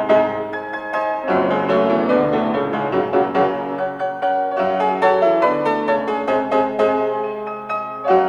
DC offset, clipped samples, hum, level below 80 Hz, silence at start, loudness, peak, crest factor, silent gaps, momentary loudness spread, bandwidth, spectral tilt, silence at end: under 0.1%; under 0.1%; none; -56 dBFS; 0 s; -19 LUFS; -4 dBFS; 14 dB; none; 8 LU; 9.2 kHz; -7 dB/octave; 0 s